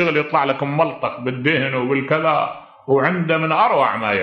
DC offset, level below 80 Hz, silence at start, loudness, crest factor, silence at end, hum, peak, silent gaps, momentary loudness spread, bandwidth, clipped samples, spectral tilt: under 0.1%; -64 dBFS; 0 s; -18 LUFS; 16 dB; 0 s; none; -2 dBFS; none; 6 LU; 6.2 kHz; under 0.1%; -8 dB/octave